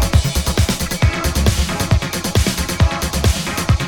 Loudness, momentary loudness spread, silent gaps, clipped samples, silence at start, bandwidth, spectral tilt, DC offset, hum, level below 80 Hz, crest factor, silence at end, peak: -17 LUFS; 2 LU; none; under 0.1%; 0 s; 19 kHz; -4.5 dB/octave; under 0.1%; none; -22 dBFS; 16 dB; 0 s; 0 dBFS